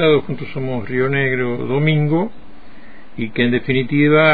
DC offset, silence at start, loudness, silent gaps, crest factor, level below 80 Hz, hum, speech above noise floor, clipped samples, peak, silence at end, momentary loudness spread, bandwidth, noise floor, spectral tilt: 4%; 0 s; -18 LUFS; none; 16 dB; -48 dBFS; none; 26 dB; under 0.1%; -2 dBFS; 0 s; 11 LU; 4.8 kHz; -42 dBFS; -10 dB/octave